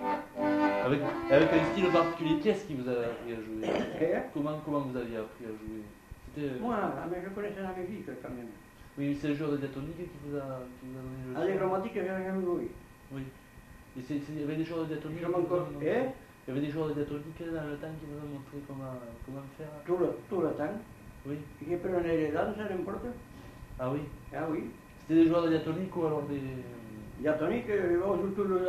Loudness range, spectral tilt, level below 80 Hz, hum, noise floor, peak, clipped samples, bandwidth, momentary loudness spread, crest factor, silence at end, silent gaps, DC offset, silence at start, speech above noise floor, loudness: 8 LU; -7.5 dB/octave; -56 dBFS; none; -52 dBFS; -10 dBFS; under 0.1%; 14 kHz; 16 LU; 22 dB; 0 s; none; under 0.1%; 0 s; 20 dB; -33 LUFS